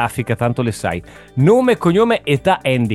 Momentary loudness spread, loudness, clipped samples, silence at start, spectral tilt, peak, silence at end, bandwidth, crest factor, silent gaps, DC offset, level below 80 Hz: 10 LU; -16 LUFS; under 0.1%; 0 s; -6.5 dB/octave; 0 dBFS; 0 s; 12.5 kHz; 14 dB; none; 0.2%; -44 dBFS